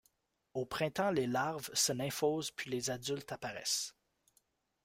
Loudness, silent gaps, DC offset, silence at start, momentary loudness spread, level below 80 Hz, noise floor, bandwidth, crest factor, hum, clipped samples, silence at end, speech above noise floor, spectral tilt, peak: -36 LUFS; none; under 0.1%; 0.55 s; 9 LU; -70 dBFS; -77 dBFS; 16 kHz; 18 dB; none; under 0.1%; 0.95 s; 40 dB; -3 dB/octave; -20 dBFS